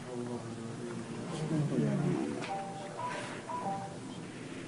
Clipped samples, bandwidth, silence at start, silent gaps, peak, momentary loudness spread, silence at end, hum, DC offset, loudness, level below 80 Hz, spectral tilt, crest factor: under 0.1%; 11 kHz; 0 s; none; -20 dBFS; 11 LU; 0 s; none; under 0.1%; -37 LUFS; -70 dBFS; -6.5 dB/octave; 16 dB